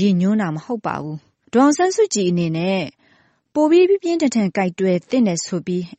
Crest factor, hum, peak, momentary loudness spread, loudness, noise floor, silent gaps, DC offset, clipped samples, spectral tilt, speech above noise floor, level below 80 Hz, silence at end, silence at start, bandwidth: 14 dB; none; -4 dBFS; 11 LU; -18 LUFS; -58 dBFS; none; under 0.1%; under 0.1%; -5.5 dB/octave; 40 dB; -62 dBFS; 0.1 s; 0 s; 8.8 kHz